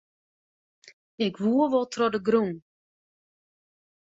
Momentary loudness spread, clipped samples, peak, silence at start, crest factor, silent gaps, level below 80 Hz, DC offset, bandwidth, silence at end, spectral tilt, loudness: 8 LU; under 0.1%; -10 dBFS; 0.85 s; 18 dB; 0.93-1.18 s; -70 dBFS; under 0.1%; 8 kHz; 1.55 s; -6 dB/octave; -25 LUFS